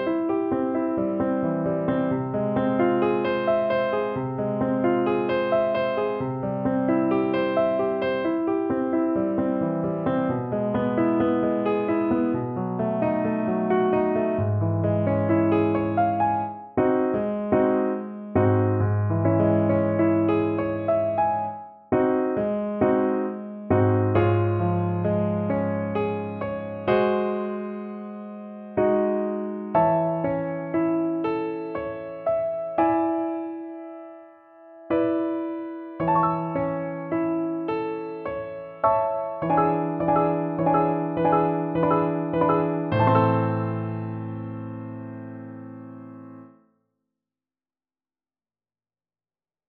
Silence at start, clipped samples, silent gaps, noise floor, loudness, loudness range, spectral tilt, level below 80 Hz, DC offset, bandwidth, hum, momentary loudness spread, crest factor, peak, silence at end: 0 s; under 0.1%; none; under -90 dBFS; -24 LUFS; 5 LU; -11.5 dB/octave; -56 dBFS; under 0.1%; 5.2 kHz; none; 11 LU; 16 dB; -8 dBFS; 3.25 s